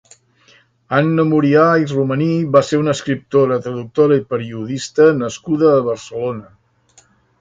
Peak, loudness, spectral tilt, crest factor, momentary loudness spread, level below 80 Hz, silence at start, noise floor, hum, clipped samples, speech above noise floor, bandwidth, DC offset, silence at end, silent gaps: 0 dBFS; -16 LUFS; -6.5 dB/octave; 16 dB; 11 LU; -56 dBFS; 0.9 s; -53 dBFS; none; under 0.1%; 38 dB; 9 kHz; under 0.1%; 0.95 s; none